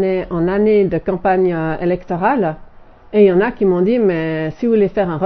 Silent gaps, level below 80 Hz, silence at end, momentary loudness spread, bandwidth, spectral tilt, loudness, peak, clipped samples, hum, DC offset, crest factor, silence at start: none; -42 dBFS; 0 s; 7 LU; 5.2 kHz; -10 dB/octave; -16 LUFS; 0 dBFS; under 0.1%; none; under 0.1%; 14 dB; 0 s